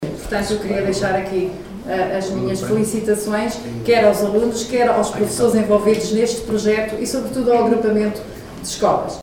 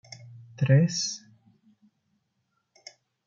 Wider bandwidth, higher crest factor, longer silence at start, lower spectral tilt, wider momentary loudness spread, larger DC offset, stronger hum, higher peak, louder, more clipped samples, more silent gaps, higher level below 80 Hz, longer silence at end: first, 17.5 kHz vs 7.6 kHz; about the same, 16 dB vs 20 dB; second, 0 s vs 0.25 s; about the same, -5 dB/octave vs -5.5 dB/octave; second, 9 LU vs 27 LU; neither; neither; first, -2 dBFS vs -10 dBFS; first, -18 LUFS vs -25 LUFS; neither; neither; first, -42 dBFS vs -72 dBFS; second, 0 s vs 2.1 s